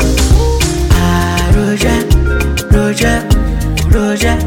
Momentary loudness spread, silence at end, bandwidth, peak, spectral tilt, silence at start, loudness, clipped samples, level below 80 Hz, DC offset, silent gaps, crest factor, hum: 3 LU; 0 s; 17.5 kHz; 0 dBFS; -5.5 dB/octave; 0 s; -12 LUFS; under 0.1%; -14 dBFS; under 0.1%; none; 10 dB; none